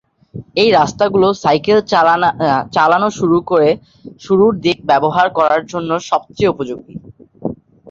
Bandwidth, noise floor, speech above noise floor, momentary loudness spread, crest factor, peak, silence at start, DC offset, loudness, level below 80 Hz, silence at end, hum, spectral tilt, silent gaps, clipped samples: 7.6 kHz; -34 dBFS; 20 dB; 15 LU; 14 dB; 0 dBFS; 0.35 s; under 0.1%; -14 LUFS; -50 dBFS; 0.35 s; none; -5.5 dB/octave; none; under 0.1%